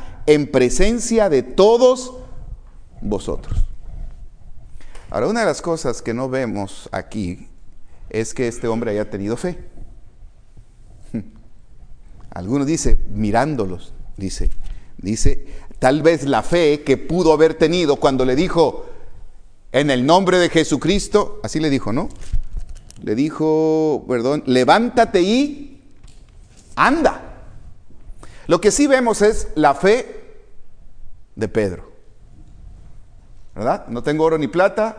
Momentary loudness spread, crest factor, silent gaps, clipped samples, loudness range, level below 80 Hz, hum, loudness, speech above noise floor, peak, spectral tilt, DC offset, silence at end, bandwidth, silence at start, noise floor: 17 LU; 18 dB; none; under 0.1%; 9 LU; -30 dBFS; none; -18 LUFS; 27 dB; 0 dBFS; -5 dB/octave; under 0.1%; 0 s; 10.5 kHz; 0 s; -43 dBFS